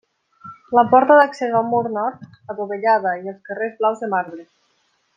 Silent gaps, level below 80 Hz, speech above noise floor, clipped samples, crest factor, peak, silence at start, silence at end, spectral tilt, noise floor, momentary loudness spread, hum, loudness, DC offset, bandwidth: none; -70 dBFS; 47 dB; under 0.1%; 18 dB; -2 dBFS; 0.45 s; 0.75 s; -6.5 dB/octave; -65 dBFS; 16 LU; none; -18 LUFS; under 0.1%; 7.6 kHz